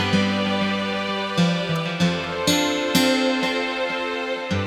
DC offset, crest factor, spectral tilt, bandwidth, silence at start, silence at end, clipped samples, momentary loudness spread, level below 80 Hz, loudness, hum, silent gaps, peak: under 0.1%; 16 dB; -4.5 dB/octave; 17 kHz; 0 s; 0 s; under 0.1%; 5 LU; -56 dBFS; -22 LUFS; none; none; -4 dBFS